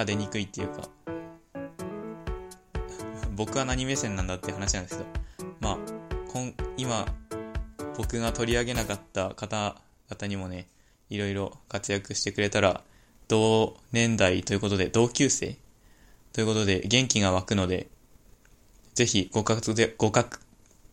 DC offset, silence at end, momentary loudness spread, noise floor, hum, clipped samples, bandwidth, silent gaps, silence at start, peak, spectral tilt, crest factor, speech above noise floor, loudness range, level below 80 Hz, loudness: under 0.1%; 0.55 s; 15 LU; -57 dBFS; none; under 0.1%; 16.5 kHz; none; 0 s; -4 dBFS; -4 dB/octave; 24 dB; 30 dB; 8 LU; -44 dBFS; -28 LUFS